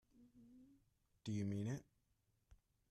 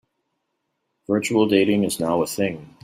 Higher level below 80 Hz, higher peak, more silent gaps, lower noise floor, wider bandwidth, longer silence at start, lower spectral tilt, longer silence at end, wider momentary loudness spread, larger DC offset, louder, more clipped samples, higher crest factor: second, -76 dBFS vs -62 dBFS; second, -34 dBFS vs -4 dBFS; neither; first, -83 dBFS vs -76 dBFS; second, 12.5 kHz vs 16 kHz; second, 0.2 s vs 1.1 s; first, -7 dB/octave vs -5 dB/octave; first, 0.35 s vs 0.2 s; first, 24 LU vs 8 LU; neither; second, -46 LUFS vs -21 LUFS; neither; about the same, 16 dB vs 18 dB